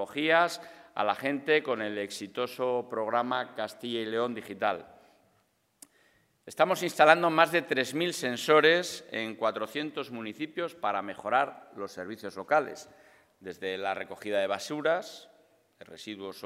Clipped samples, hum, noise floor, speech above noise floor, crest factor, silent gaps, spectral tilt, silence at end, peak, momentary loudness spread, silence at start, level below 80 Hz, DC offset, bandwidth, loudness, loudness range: under 0.1%; none; -71 dBFS; 42 dB; 28 dB; none; -3.5 dB/octave; 0 s; -2 dBFS; 17 LU; 0 s; -82 dBFS; under 0.1%; 16 kHz; -29 LUFS; 9 LU